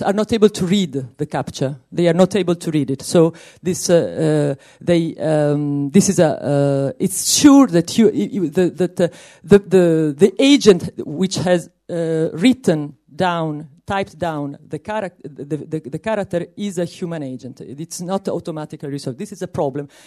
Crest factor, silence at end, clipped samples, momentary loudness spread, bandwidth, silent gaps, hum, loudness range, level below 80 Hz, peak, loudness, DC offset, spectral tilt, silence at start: 18 dB; 0.2 s; under 0.1%; 15 LU; 13.5 kHz; none; none; 10 LU; -54 dBFS; 0 dBFS; -17 LUFS; under 0.1%; -5.5 dB/octave; 0 s